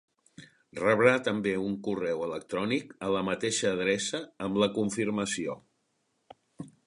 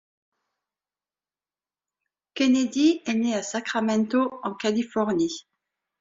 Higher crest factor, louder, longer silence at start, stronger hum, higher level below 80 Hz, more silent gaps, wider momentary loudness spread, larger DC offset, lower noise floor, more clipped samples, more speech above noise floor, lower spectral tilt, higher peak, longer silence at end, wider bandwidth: first, 24 dB vs 16 dB; second, -29 LUFS vs -24 LUFS; second, 0.4 s vs 2.35 s; neither; about the same, -66 dBFS vs -70 dBFS; neither; first, 11 LU vs 7 LU; neither; second, -76 dBFS vs under -90 dBFS; neither; second, 47 dB vs over 66 dB; about the same, -4 dB/octave vs -4.5 dB/octave; first, -6 dBFS vs -10 dBFS; second, 0.15 s vs 0.6 s; first, 11.5 kHz vs 7.8 kHz